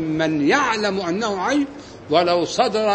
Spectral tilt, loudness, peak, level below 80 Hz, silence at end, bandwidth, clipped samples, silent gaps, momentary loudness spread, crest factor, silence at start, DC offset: -4.5 dB/octave; -20 LUFS; -4 dBFS; -54 dBFS; 0 s; 8.8 kHz; under 0.1%; none; 5 LU; 16 dB; 0 s; under 0.1%